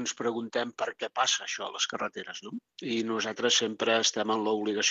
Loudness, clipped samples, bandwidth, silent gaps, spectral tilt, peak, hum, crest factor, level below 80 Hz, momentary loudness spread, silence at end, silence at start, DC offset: -29 LUFS; under 0.1%; 8.2 kHz; none; -1.5 dB/octave; -12 dBFS; none; 18 dB; -82 dBFS; 12 LU; 0 s; 0 s; under 0.1%